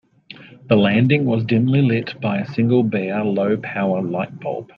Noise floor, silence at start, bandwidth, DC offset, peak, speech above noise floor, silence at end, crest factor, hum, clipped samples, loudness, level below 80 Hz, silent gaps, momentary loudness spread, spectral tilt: -43 dBFS; 0.3 s; 5.6 kHz; under 0.1%; -2 dBFS; 25 dB; 0.1 s; 16 dB; none; under 0.1%; -19 LUFS; -58 dBFS; none; 9 LU; -9.5 dB/octave